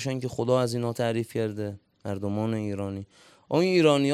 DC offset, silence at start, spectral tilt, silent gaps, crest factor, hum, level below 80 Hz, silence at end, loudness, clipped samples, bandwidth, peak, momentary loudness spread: under 0.1%; 0 s; -6 dB/octave; none; 20 dB; none; -66 dBFS; 0 s; -27 LUFS; under 0.1%; 14 kHz; -8 dBFS; 15 LU